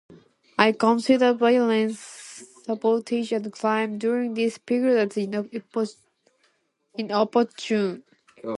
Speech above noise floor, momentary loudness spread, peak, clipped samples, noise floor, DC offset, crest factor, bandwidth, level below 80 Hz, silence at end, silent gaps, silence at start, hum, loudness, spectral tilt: 46 dB; 17 LU; -2 dBFS; under 0.1%; -69 dBFS; under 0.1%; 22 dB; 11.5 kHz; -74 dBFS; 0.05 s; none; 0.1 s; none; -23 LUFS; -5 dB/octave